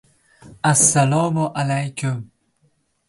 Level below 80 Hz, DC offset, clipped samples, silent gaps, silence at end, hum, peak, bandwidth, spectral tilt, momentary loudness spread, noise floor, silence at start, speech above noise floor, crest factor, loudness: -58 dBFS; under 0.1%; under 0.1%; none; 0.85 s; none; -4 dBFS; 12 kHz; -4.5 dB/octave; 12 LU; -64 dBFS; 0.45 s; 46 dB; 18 dB; -18 LUFS